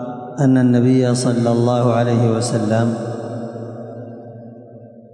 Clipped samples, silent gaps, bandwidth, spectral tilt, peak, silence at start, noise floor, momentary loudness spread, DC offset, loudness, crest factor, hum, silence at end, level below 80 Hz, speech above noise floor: under 0.1%; none; 11.5 kHz; -7 dB/octave; -4 dBFS; 0 s; -40 dBFS; 20 LU; under 0.1%; -17 LUFS; 12 dB; none; 0.15 s; -64 dBFS; 25 dB